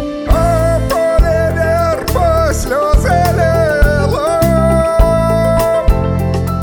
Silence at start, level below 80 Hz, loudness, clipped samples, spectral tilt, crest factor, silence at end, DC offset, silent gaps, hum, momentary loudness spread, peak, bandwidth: 0 s; -18 dBFS; -13 LUFS; under 0.1%; -6.5 dB/octave; 12 dB; 0 s; under 0.1%; none; none; 3 LU; 0 dBFS; 19.5 kHz